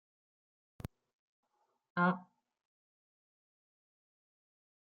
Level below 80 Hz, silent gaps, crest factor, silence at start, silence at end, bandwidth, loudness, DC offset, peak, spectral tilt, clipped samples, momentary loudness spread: -70 dBFS; none; 26 dB; 1.95 s; 2.6 s; 6.8 kHz; -35 LUFS; under 0.1%; -18 dBFS; -6 dB/octave; under 0.1%; 18 LU